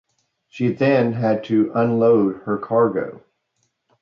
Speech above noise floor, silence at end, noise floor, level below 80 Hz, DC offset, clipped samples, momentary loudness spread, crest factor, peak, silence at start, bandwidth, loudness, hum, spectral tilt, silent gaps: 53 dB; 0.85 s; -71 dBFS; -62 dBFS; under 0.1%; under 0.1%; 9 LU; 14 dB; -6 dBFS; 0.55 s; 6.8 kHz; -19 LUFS; none; -9 dB/octave; none